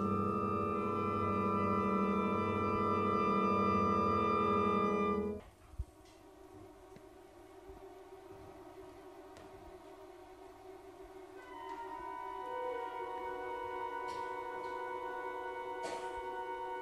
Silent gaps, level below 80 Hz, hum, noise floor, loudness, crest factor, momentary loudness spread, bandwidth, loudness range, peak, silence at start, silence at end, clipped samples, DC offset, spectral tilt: none; -60 dBFS; none; -58 dBFS; -36 LUFS; 18 dB; 23 LU; 13.5 kHz; 22 LU; -20 dBFS; 0 s; 0 s; under 0.1%; under 0.1%; -7.5 dB/octave